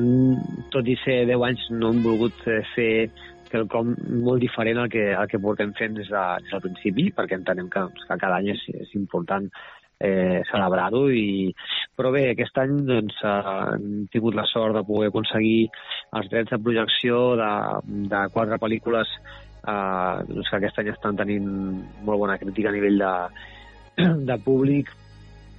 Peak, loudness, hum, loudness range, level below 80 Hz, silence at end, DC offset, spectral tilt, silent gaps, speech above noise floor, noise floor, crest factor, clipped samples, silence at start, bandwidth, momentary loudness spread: -10 dBFS; -24 LUFS; none; 3 LU; -54 dBFS; 0 s; under 0.1%; -9 dB/octave; none; 22 dB; -46 dBFS; 14 dB; under 0.1%; 0 s; 5.4 kHz; 8 LU